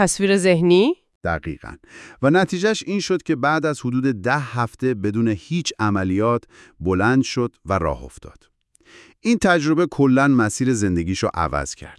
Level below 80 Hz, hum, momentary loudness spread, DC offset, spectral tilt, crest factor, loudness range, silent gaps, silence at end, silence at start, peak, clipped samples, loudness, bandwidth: -46 dBFS; none; 10 LU; under 0.1%; -5.5 dB/octave; 18 dB; 3 LU; 1.15-1.21 s; 0.05 s; 0 s; -2 dBFS; under 0.1%; -20 LUFS; 12 kHz